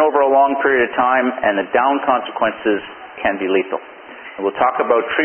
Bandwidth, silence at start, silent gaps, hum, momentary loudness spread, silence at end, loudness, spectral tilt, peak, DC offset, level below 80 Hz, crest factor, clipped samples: 3.3 kHz; 0 s; none; none; 12 LU; 0 s; -17 LUFS; -9.5 dB/octave; -2 dBFS; under 0.1%; -56 dBFS; 16 dB; under 0.1%